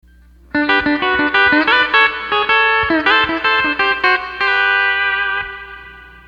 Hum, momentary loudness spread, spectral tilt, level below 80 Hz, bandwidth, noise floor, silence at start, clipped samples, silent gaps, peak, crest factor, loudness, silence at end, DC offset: none; 8 LU; -4.5 dB/octave; -44 dBFS; 7.6 kHz; -45 dBFS; 0.55 s; under 0.1%; none; 0 dBFS; 16 dB; -13 LUFS; 0.2 s; under 0.1%